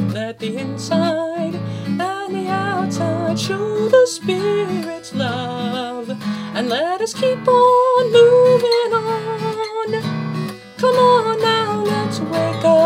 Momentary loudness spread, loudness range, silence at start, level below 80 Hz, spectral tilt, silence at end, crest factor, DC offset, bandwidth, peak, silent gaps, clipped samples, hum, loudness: 12 LU; 6 LU; 0 s; -62 dBFS; -5.5 dB/octave; 0 s; 16 dB; under 0.1%; 15.5 kHz; 0 dBFS; none; under 0.1%; none; -18 LUFS